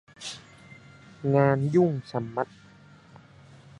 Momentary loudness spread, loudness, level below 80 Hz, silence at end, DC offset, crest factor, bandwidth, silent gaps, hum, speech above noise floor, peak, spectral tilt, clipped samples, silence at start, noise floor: 17 LU; -26 LUFS; -66 dBFS; 1.35 s; under 0.1%; 22 dB; 11 kHz; none; none; 29 dB; -6 dBFS; -7.5 dB/octave; under 0.1%; 0.2 s; -53 dBFS